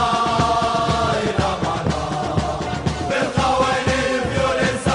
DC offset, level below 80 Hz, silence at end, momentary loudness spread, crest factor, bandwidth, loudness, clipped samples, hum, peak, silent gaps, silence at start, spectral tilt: under 0.1%; -36 dBFS; 0 s; 5 LU; 14 dB; 10.5 kHz; -20 LUFS; under 0.1%; none; -6 dBFS; none; 0 s; -5 dB/octave